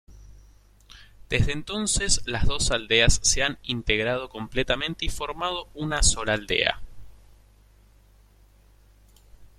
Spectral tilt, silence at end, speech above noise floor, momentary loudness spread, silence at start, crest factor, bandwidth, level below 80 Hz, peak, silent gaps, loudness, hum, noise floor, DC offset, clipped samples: -2.5 dB/octave; 0.15 s; 32 dB; 10 LU; 0.1 s; 22 dB; 13.5 kHz; -34 dBFS; -4 dBFS; none; -24 LUFS; 50 Hz at -45 dBFS; -56 dBFS; under 0.1%; under 0.1%